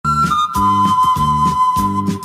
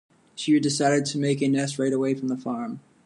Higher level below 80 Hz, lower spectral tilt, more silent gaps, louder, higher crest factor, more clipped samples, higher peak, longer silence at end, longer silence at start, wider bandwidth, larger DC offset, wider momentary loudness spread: first, -34 dBFS vs -72 dBFS; about the same, -5.5 dB/octave vs -5 dB/octave; neither; first, -14 LUFS vs -24 LUFS; second, 10 dB vs 16 dB; neither; first, -4 dBFS vs -10 dBFS; second, 0 s vs 0.25 s; second, 0.05 s vs 0.35 s; first, 16 kHz vs 11.5 kHz; neither; second, 2 LU vs 10 LU